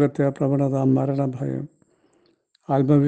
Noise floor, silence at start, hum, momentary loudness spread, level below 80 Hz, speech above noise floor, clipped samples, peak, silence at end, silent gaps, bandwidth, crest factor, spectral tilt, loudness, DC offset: -63 dBFS; 0 s; none; 9 LU; -58 dBFS; 43 dB; under 0.1%; -6 dBFS; 0 s; none; 8 kHz; 16 dB; -10 dB/octave; -22 LUFS; under 0.1%